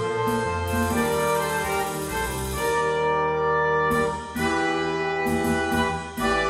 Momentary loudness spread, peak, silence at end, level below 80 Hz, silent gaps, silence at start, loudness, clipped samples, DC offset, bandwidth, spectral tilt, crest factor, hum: 5 LU; -10 dBFS; 0 s; -42 dBFS; none; 0 s; -24 LUFS; under 0.1%; under 0.1%; 16 kHz; -4.5 dB/octave; 14 dB; none